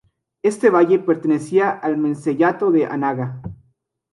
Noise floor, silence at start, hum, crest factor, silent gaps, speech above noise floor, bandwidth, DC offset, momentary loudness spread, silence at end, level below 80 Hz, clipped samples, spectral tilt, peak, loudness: -64 dBFS; 0.45 s; none; 16 dB; none; 47 dB; 11.5 kHz; under 0.1%; 10 LU; 0.6 s; -56 dBFS; under 0.1%; -7.5 dB/octave; -2 dBFS; -18 LUFS